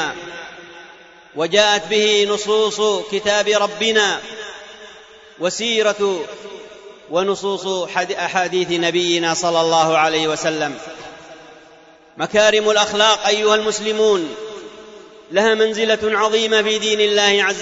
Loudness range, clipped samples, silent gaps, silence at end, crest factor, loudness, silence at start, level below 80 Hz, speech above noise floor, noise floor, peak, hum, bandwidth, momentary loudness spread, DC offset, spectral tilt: 4 LU; under 0.1%; none; 0 s; 16 dB; -17 LUFS; 0 s; -60 dBFS; 29 dB; -46 dBFS; -2 dBFS; none; 8 kHz; 19 LU; under 0.1%; -2 dB/octave